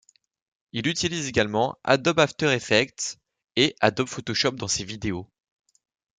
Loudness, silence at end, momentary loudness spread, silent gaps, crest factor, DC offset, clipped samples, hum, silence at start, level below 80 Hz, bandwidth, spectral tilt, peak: -24 LUFS; 0.95 s; 11 LU; none; 24 dB; under 0.1%; under 0.1%; none; 0.75 s; -56 dBFS; 9.6 kHz; -3.5 dB/octave; -2 dBFS